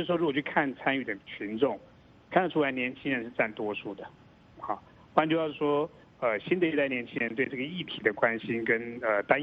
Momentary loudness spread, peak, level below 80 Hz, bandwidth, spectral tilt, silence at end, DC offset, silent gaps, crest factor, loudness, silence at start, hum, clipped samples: 11 LU; -6 dBFS; -68 dBFS; 5.4 kHz; -8 dB/octave; 0 s; under 0.1%; none; 24 dB; -30 LUFS; 0 s; none; under 0.1%